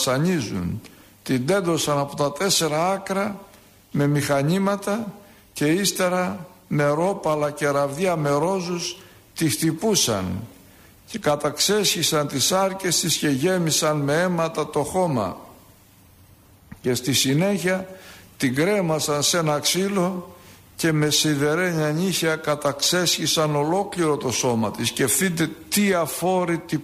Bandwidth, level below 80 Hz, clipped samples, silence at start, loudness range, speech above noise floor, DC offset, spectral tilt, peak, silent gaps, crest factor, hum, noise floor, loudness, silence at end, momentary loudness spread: 15.5 kHz; -56 dBFS; under 0.1%; 0 s; 4 LU; 30 dB; under 0.1%; -4 dB/octave; -6 dBFS; none; 16 dB; none; -52 dBFS; -22 LUFS; 0 s; 9 LU